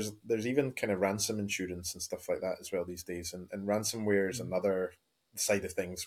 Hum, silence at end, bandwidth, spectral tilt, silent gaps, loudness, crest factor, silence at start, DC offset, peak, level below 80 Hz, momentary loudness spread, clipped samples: none; 0 s; 17.5 kHz; -4 dB/octave; none; -34 LUFS; 20 dB; 0 s; under 0.1%; -14 dBFS; -68 dBFS; 9 LU; under 0.1%